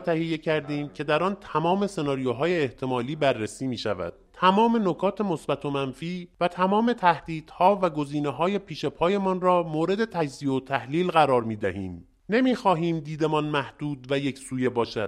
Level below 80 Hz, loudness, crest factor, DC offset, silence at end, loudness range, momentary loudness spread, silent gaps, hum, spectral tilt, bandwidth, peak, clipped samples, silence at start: -58 dBFS; -25 LUFS; 22 dB; under 0.1%; 0 s; 2 LU; 9 LU; none; none; -6.5 dB/octave; 12 kHz; -4 dBFS; under 0.1%; 0 s